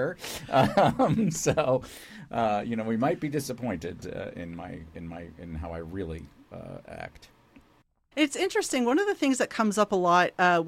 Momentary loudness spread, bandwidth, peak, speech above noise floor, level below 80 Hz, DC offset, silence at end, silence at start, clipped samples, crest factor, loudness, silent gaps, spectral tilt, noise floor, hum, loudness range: 19 LU; 16.5 kHz; -10 dBFS; 37 dB; -52 dBFS; under 0.1%; 0 s; 0 s; under 0.1%; 18 dB; -27 LUFS; none; -5 dB/octave; -64 dBFS; none; 14 LU